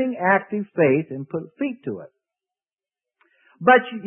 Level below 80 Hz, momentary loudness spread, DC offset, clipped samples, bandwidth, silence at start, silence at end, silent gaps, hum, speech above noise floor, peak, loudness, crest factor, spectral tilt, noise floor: -72 dBFS; 16 LU; under 0.1%; under 0.1%; 3.6 kHz; 0 s; 0 s; none; none; over 69 dB; -2 dBFS; -21 LUFS; 20 dB; -11 dB/octave; under -90 dBFS